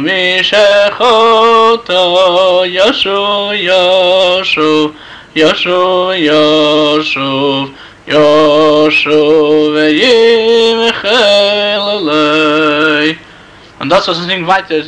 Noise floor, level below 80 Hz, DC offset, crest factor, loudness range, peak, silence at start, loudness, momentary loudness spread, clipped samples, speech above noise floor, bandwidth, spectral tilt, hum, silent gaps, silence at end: -36 dBFS; -48 dBFS; under 0.1%; 8 dB; 3 LU; -2 dBFS; 0 s; -9 LUFS; 6 LU; under 0.1%; 27 dB; 9.8 kHz; -4 dB/octave; none; none; 0 s